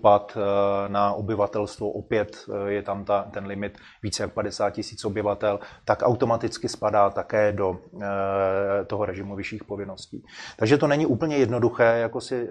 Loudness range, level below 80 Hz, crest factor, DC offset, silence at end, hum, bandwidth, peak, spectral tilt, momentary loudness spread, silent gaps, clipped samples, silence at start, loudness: 4 LU; -56 dBFS; 22 dB; under 0.1%; 0 s; none; 11.5 kHz; -4 dBFS; -6 dB/octave; 13 LU; none; under 0.1%; 0.05 s; -25 LUFS